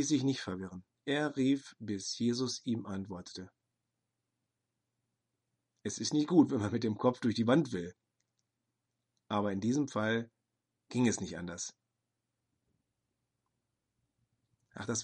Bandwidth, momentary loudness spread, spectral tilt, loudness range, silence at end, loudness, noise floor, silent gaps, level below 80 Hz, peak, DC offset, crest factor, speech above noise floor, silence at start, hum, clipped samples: 10.5 kHz; 15 LU; -5 dB/octave; 13 LU; 0 s; -33 LUFS; -86 dBFS; none; -74 dBFS; -12 dBFS; under 0.1%; 24 dB; 54 dB; 0 s; none; under 0.1%